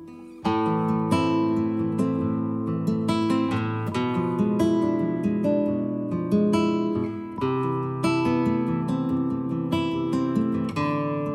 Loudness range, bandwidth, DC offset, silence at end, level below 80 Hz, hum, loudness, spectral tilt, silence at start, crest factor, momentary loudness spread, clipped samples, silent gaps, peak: 1 LU; 12.5 kHz; under 0.1%; 0 s; -58 dBFS; none; -25 LUFS; -7.5 dB/octave; 0 s; 14 dB; 5 LU; under 0.1%; none; -10 dBFS